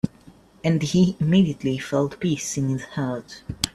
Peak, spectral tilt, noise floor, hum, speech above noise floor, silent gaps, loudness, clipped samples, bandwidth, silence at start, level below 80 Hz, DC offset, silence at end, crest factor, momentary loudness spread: -2 dBFS; -5.5 dB/octave; -51 dBFS; none; 28 dB; none; -23 LUFS; under 0.1%; 14 kHz; 0.05 s; -50 dBFS; under 0.1%; 0.05 s; 22 dB; 10 LU